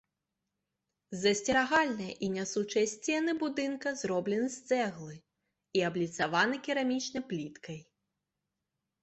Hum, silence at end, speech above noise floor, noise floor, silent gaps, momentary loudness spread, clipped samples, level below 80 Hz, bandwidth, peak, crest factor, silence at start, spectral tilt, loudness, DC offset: none; 1.2 s; 55 dB; -87 dBFS; none; 12 LU; under 0.1%; -72 dBFS; 8.4 kHz; -12 dBFS; 20 dB; 1.1 s; -4 dB/octave; -32 LUFS; under 0.1%